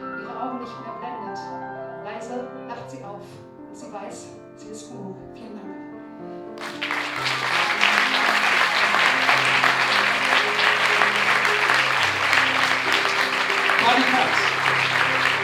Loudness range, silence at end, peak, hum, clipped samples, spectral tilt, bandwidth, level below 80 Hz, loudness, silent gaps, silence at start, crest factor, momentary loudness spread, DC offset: 19 LU; 0 s; 0 dBFS; none; under 0.1%; -2 dB/octave; 19 kHz; -66 dBFS; -18 LUFS; none; 0 s; 22 dB; 20 LU; under 0.1%